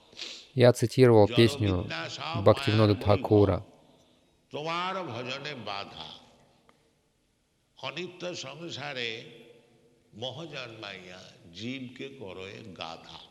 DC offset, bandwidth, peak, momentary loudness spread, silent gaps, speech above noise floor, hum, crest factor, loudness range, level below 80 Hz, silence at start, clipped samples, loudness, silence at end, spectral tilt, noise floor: under 0.1%; 14 kHz; -6 dBFS; 19 LU; none; 44 dB; none; 22 dB; 17 LU; -60 dBFS; 0.15 s; under 0.1%; -27 LUFS; 0.05 s; -6.5 dB/octave; -71 dBFS